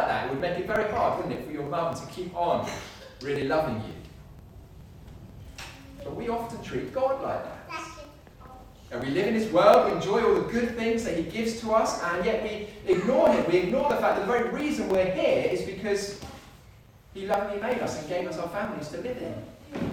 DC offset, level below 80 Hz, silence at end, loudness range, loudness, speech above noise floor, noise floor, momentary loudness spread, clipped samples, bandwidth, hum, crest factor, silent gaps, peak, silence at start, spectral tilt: under 0.1%; -52 dBFS; 0 s; 9 LU; -27 LUFS; 26 dB; -52 dBFS; 18 LU; under 0.1%; 18 kHz; none; 22 dB; none; -6 dBFS; 0 s; -5.5 dB/octave